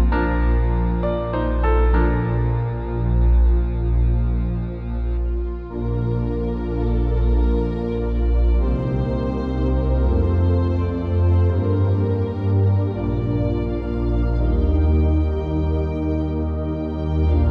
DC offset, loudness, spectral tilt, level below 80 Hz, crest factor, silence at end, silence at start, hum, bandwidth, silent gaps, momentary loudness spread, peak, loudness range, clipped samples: under 0.1%; -21 LUFS; -10.5 dB/octave; -22 dBFS; 12 dB; 0 s; 0 s; none; 4.5 kHz; none; 6 LU; -6 dBFS; 3 LU; under 0.1%